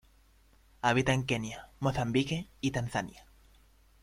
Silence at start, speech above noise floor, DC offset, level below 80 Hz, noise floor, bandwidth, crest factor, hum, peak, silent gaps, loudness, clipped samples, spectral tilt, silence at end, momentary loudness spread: 0.85 s; 32 dB; under 0.1%; -54 dBFS; -63 dBFS; 15 kHz; 22 dB; none; -12 dBFS; none; -32 LUFS; under 0.1%; -5.5 dB/octave; 0.8 s; 8 LU